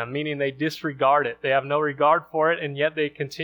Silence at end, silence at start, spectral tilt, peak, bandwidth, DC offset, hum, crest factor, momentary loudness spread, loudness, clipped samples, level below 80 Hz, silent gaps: 0 s; 0 s; -6 dB/octave; -6 dBFS; over 20 kHz; under 0.1%; none; 16 dB; 7 LU; -23 LUFS; under 0.1%; -68 dBFS; none